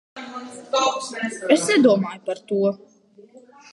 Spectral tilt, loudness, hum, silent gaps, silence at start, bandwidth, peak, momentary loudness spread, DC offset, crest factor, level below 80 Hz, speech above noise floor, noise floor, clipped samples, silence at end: -4 dB/octave; -21 LUFS; none; none; 0.15 s; 11.5 kHz; -2 dBFS; 19 LU; under 0.1%; 20 dB; -74 dBFS; 29 dB; -50 dBFS; under 0.1%; 0.35 s